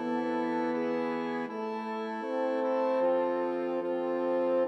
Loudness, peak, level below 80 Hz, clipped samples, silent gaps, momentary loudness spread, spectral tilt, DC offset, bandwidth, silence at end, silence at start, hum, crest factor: -31 LUFS; -20 dBFS; under -90 dBFS; under 0.1%; none; 7 LU; -7 dB/octave; under 0.1%; 6.6 kHz; 0 s; 0 s; none; 12 dB